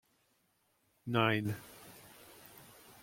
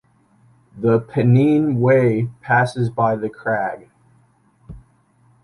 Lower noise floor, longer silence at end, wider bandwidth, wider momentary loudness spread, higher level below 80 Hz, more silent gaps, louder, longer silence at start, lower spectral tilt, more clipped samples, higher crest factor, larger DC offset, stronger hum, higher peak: first, -76 dBFS vs -57 dBFS; second, 0.1 s vs 0.65 s; first, 16.5 kHz vs 11 kHz; first, 24 LU vs 9 LU; second, -74 dBFS vs -52 dBFS; neither; second, -34 LUFS vs -18 LUFS; first, 1.05 s vs 0.75 s; second, -6 dB/octave vs -9 dB/octave; neither; first, 24 dB vs 16 dB; neither; neither; second, -14 dBFS vs -4 dBFS